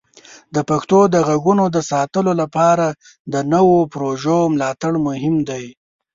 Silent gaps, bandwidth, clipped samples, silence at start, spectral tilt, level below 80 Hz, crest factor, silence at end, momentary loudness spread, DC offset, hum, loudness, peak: 3.20-3.25 s; 7.8 kHz; under 0.1%; 0.3 s; -6.5 dB/octave; -54 dBFS; 14 dB; 0.45 s; 11 LU; under 0.1%; none; -17 LUFS; -2 dBFS